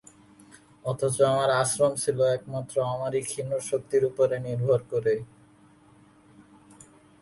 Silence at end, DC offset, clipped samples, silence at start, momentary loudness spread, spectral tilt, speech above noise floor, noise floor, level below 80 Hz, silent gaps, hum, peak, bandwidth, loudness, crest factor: 1.95 s; under 0.1%; under 0.1%; 0.85 s; 8 LU; -5 dB/octave; 31 dB; -56 dBFS; -64 dBFS; none; none; -8 dBFS; 12 kHz; -26 LUFS; 18 dB